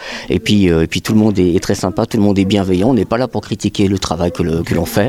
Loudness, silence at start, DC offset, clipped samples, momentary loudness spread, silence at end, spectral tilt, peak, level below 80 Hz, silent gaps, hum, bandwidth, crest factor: -15 LUFS; 0 s; under 0.1%; under 0.1%; 6 LU; 0 s; -6 dB/octave; -2 dBFS; -36 dBFS; none; none; 16 kHz; 12 dB